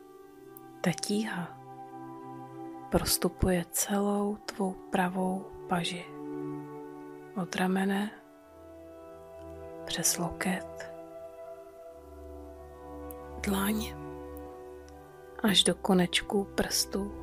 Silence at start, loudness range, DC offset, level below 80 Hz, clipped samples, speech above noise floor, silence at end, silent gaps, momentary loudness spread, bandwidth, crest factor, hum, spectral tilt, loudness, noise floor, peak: 0 s; 8 LU; under 0.1%; -50 dBFS; under 0.1%; 23 dB; 0 s; none; 21 LU; 16 kHz; 22 dB; none; -3.5 dB/octave; -30 LUFS; -53 dBFS; -12 dBFS